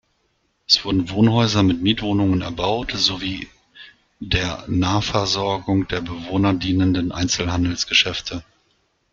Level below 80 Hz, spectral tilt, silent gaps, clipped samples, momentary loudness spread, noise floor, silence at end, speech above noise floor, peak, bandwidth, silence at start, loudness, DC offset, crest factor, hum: -42 dBFS; -4.5 dB/octave; none; under 0.1%; 10 LU; -67 dBFS; 0.7 s; 47 dB; 0 dBFS; 7.6 kHz; 0.7 s; -20 LUFS; under 0.1%; 20 dB; none